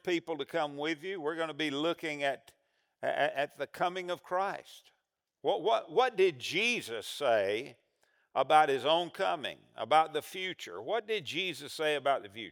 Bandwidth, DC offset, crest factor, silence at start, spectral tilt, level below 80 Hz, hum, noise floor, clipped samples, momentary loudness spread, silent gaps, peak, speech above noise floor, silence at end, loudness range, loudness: over 20 kHz; under 0.1%; 22 dB; 0.05 s; -3.5 dB/octave; -88 dBFS; none; -82 dBFS; under 0.1%; 10 LU; none; -10 dBFS; 50 dB; 0 s; 5 LU; -32 LUFS